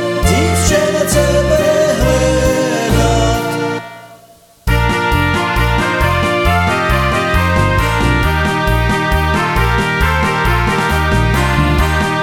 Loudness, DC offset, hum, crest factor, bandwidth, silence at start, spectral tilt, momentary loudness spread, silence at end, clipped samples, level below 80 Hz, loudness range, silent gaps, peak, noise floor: -13 LUFS; under 0.1%; none; 12 dB; 18.5 kHz; 0 s; -5 dB/octave; 2 LU; 0 s; under 0.1%; -20 dBFS; 3 LU; none; 0 dBFS; -44 dBFS